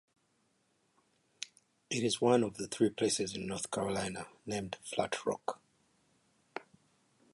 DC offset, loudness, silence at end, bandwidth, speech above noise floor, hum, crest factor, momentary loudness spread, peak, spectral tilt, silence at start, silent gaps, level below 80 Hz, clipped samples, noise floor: under 0.1%; -34 LUFS; 0.7 s; 11.5 kHz; 41 dB; none; 22 dB; 17 LU; -14 dBFS; -4 dB/octave; 1.4 s; none; -68 dBFS; under 0.1%; -75 dBFS